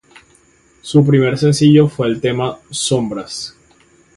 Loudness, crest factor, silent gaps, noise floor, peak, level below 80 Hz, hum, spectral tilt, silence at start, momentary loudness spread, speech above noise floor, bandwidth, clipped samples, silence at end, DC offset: -14 LUFS; 16 dB; none; -52 dBFS; 0 dBFS; -50 dBFS; none; -6 dB/octave; 0.85 s; 16 LU; 38 dB; 11.5 kHz; under 0.1%; 0.7 s; under 0.1%